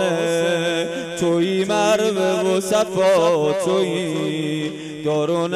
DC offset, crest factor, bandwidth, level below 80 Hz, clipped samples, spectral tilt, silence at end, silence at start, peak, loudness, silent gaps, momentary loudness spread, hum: under 0.1%; 12 dB; 15.5 kHz; -62 dBFS; under 0.1%; -4.5 dB/octave; 0 s; 0 s; -6 dBFS; -19 LUFS; none; 7 LU; none